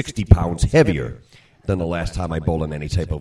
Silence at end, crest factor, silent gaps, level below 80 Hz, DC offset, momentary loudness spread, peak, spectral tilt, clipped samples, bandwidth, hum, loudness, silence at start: 0 s; 20 dB; none; -26 dBFS; under 0.1%; 10 LU; 0 dBFS; -7 dB/octave; under 0.1%; 11.5 kHz; none; -20 LUFS; 0 s